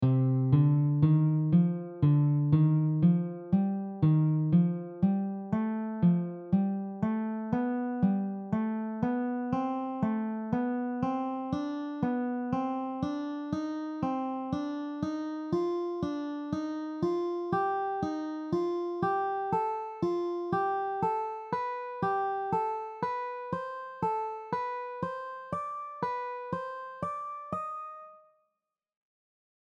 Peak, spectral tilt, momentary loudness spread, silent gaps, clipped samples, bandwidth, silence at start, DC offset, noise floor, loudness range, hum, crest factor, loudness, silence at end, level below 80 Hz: -12 dBFS; -10 dB/octave; 11 LU; none; under 0.1%; 6.2 kHz; 0 s; under 0.1%; -86 dBFS; 9 LU; none; 18 dB; -31 LUFS; 1.6 s; -64 dBFS